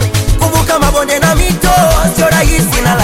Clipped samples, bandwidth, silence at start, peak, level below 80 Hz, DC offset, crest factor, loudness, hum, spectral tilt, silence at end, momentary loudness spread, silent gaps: under 0.1%; 17 kHz; 0 s; 0 dBFS; -16 dBFS; under 0.1%; 10 dB; -10 LUFS; none; -4.5 dB/octave; 0 s; 3 LU; none